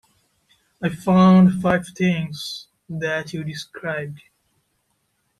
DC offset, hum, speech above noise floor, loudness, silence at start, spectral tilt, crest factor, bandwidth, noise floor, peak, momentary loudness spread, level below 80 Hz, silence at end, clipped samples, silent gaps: under 0.1%; none; 51 dB; -20 LUFS; 0.8 s; -7 dB/octave; 18 dB; 12 kHz; -70 dBFS; -4 dBFS; 18 LU; -56 dBFS; 1.25 s; under 0.1%; none